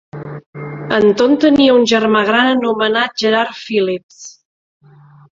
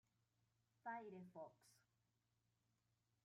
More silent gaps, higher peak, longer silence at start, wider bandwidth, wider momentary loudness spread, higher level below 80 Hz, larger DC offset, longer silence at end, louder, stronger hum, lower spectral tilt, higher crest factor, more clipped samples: first, 0.46-0.53 s, 4.03-4.09 s vs none; first, 0 dBFS vs -40 dBFS; second, 0.15 s vs 0.85 s; second, 7.6 kHz vs 13 kHz; first, 19 LU vs 7 LU; first, -54 dBFS vs under -90 dBFS; neither; second, 1.1 s vs 1.45 s; first, -13 LUFS vs -57 LUFS; neither; second, -4.5 dB/octave vs -6 dB/octave; second, 14 dB vs 22 dB; neither